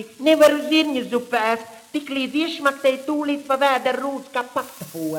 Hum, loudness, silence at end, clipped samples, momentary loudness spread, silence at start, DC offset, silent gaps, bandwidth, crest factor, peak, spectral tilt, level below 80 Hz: none; -21 LUFS; 0 s; under 0.1%; 13 LU; 0 s; under 0.1%; none; 18 kHz; 18 dB; -2 dBFS; -3.5 dB/octave; -72 dBFS